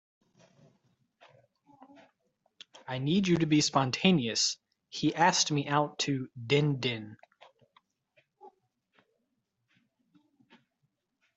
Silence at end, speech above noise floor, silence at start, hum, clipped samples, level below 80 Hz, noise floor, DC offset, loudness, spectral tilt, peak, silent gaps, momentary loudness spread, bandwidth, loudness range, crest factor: 2.9 s; 52 dB; 2.9 s; none; under 0.1%; -70 dBFS; -81 dBFS; under 0.1%; -28 LUFS; -4 dB/octave; -8 dBFS; none; 15 LU; 8.2 kHz; 10 LU; 24 dB